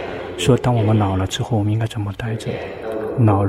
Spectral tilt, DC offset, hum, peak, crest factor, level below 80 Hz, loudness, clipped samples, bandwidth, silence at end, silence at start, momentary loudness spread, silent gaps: -6.5 dB/octave; under 0.1%; none; -2 dBFS; 16 dB; -42 dBFS; -20 LUFS; under 0.1%; 13 kHz; 0 s; 0 s; 10 LU; none